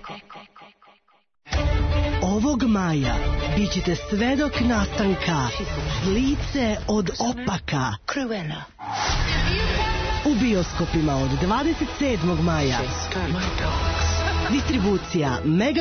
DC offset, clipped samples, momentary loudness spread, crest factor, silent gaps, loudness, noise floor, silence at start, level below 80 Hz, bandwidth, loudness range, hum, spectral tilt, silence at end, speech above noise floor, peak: under 0.1%; under 0.1%; 5 LU; 12 dB; none; -23 LUFS; -59 dBFS; 0 s; -32 dBFS; 6.6 kHz; 2 LU; none; -5.5 dB/octave; 0 s; 37 dB; -10 dBFS